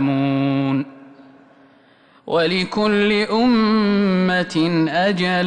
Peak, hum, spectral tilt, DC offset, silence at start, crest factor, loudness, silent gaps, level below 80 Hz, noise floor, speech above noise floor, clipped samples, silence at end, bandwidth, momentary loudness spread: -8 dBFS; none; -6.5 dB/octave; under 0.1%; 0 s; 10 dB; -18 LUFS; none; -54 dBFS; -52 dBFS; 35 dB; under 0.1%; 0 s; 9.8 kHz; 4 LU